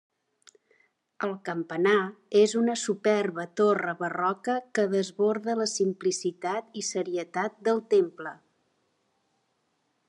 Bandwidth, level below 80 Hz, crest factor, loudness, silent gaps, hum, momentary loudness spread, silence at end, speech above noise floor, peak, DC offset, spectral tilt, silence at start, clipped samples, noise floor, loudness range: 11 kHz; -86 dBFS; 18 dB; -27 LUFS; none; none; 9 LU; 1.75 s; 48 dB; -10 dBFS; under 0.1%; -4 dB/octave; 1.2 s; under 0.1%; -75 dBFS; 5 LU